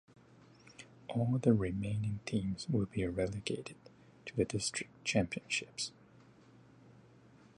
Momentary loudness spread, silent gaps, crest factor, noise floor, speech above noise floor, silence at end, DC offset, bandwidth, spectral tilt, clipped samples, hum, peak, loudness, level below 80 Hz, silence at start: 19 LU; none; 22 dB; -61 dBFS; 26 dB; 1.65 s; under 0.1%; 11.5 kHz; -5 dB/octave; under 0.1%; none; -14 dBFS; -36 LUFS; -58 dBFS; 0.65 s